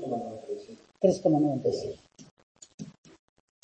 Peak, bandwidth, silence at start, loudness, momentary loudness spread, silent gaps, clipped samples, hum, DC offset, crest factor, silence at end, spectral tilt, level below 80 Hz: -10 dBFS; 8.6 kHz; 0 s; -29 LUFS; 22 LU; 2.31-2.37 s, 2.43-2.55 s, 2.74-2.78 s; under 0.1%; none; under 0.1%; 22 dB; 0.75 s; -7.5 dB/octave; -68 dBFS